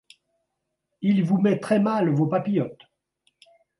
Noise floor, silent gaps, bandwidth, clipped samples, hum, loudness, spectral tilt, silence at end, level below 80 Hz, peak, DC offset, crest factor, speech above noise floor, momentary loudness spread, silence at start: -80 dBFS; none; 11.5 kHz; under 0.1%; none; -23 LUFS; -8.5 dB/octave; 1.05 s; -70 dBFS; -8 dBFS; under 0.1%; 16 dB; 58 dB; 6 LU; 1 s